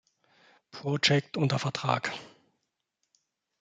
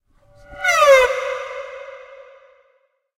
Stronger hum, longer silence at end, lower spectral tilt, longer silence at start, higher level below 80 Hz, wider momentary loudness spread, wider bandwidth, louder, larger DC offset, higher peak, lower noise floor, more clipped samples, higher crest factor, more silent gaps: neither; first, 1.35 s vs 1.15 s; first, -5 dB/octave vs 0.5 dB/octave; first, 0.75 s vs 0.5 s; second, -68 dBFS vs -52 dBFS; second, 15 LU vs 23 LU; second, 9.2 kHz vs 16 kHz; second, -28 LUFS vs -16 LUFS; neither; second, -8 dBFS vs -2 dBFS; first, -81 dBFS vs -63 dBFS; neither; first, 24 dB vs 18 dB; neither